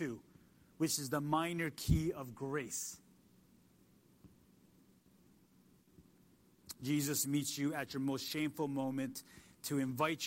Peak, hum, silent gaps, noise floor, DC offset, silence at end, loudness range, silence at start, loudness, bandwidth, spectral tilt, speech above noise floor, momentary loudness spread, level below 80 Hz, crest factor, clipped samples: -18 dBFS; none; none; -68 dBFS; under 0.1%; 0 s; 9 LU; 0 s; -38 LUFS; 16 kHz; -4.5 dB/octave; 30 dB; 11 LU; -56 dBFS; 22 dB; under 0.1%